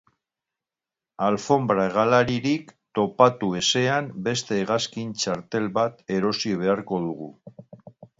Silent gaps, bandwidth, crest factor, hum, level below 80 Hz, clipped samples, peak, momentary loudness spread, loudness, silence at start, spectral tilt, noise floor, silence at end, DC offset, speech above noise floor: none; 8 kHz; 24 dB; none; -62 dBFS; under 0.1%; -2 dBFS; 9 LU; -23 LUFS; 1.2 s; -4.5 dB/octave; -89 dBFS; 0.15 s; under 0.1%; 66 dB